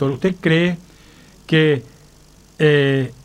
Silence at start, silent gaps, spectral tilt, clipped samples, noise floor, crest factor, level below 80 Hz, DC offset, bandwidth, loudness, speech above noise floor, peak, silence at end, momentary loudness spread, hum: 0 s; none; -7 dB/octave; under 0.1%; -48 dBFS; 16 dB; -52 dBFS; under 0.1%; 10.5 kHz; -17 LUFS; 31 dB; -2 dBFS; 0.1 s; 7 LU; none